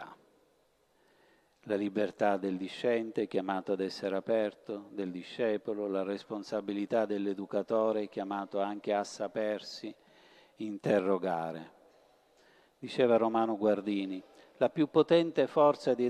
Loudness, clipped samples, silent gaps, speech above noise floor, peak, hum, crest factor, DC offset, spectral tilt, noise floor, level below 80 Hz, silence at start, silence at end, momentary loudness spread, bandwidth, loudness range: -32 LUFS; under 0.1%; none; 39 dB; -12 dBFS; none; 20 dB; under 0.1%; -6.5 dB/octave; -71 dBFS; -80 dBFS; 0 s; 0 s; 13 LU; 12 kHz; 5 LU